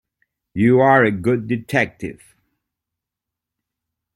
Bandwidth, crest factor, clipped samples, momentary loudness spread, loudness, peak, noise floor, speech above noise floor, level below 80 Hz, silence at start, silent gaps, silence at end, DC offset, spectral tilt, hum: 16.5 kHz; 18 dB; under 0.1%; 19 LU; -17 LUFS; -2 dBFS; -85 dBFS; 68 dB; -56 dBFS; 0.55 s; none; 2 s; under 0.1%; -7.5 dB/octave; none